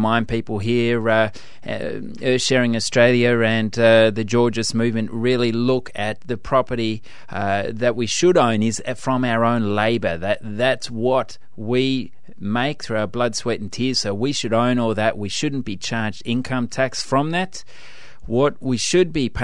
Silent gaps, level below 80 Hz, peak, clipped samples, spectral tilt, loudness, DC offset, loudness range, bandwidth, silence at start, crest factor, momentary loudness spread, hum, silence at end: none; -48 dBFS; -2 dBFS; under 0.1%; -5 dB/octave; -20 LUFS; 3%; 5 LU; 11 kHz; 0 s; 18 dB; 10 LU; none; 0 s